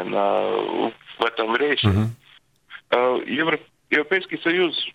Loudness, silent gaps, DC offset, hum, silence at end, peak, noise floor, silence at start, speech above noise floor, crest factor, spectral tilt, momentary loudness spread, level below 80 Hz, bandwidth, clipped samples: -22 LUFS; none; under 0.1%; none; 0.05 s; -2 dBFS; -55 dBFS; 0 s; 33 dB; 20 dB; -7 dB/octave; 6 LU; -56 dBFS; 10.5 kHz; under 0.1%